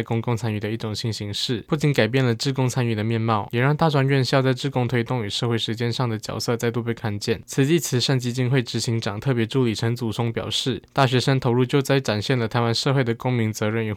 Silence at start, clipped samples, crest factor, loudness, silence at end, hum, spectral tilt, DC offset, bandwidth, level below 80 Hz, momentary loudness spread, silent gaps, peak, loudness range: 0 s; under 0.1%; 16 dB; -22 LUFS; 0 s; none; -5.5 dB/octave; under 0.1%; 16 kHz; -56 dBFS; 6 LU; none; -6 dBFS; 2 LU